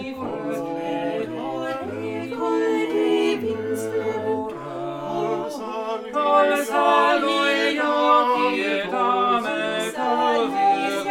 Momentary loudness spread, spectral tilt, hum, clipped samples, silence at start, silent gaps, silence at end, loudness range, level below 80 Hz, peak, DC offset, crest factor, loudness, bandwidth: 11 LU; -4 dB/octave; none; under 0.1%; 0 s; none; 0 s; 6 LU; -66 dBFS; -6 dBFS; under 0.1%; 16 dB; -22 LUFS; 17.5 kHz